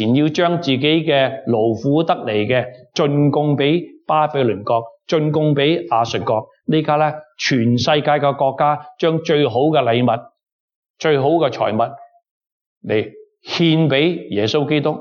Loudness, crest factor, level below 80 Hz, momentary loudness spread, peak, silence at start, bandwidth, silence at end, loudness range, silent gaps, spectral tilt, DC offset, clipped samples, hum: -17 LUFS; 16 dB; -64 dBFS; 6 LU; -2 dBFS; 0 s; 7 kHz; 0 s; 3 LU; 10.52-10.68 s, 10.76-10.83 s, 10.90-10.94 s, 12.31-12.41 s, 12.52-12.81 s; -6.5 dB/octave; under 0.1%; under 0.1%; none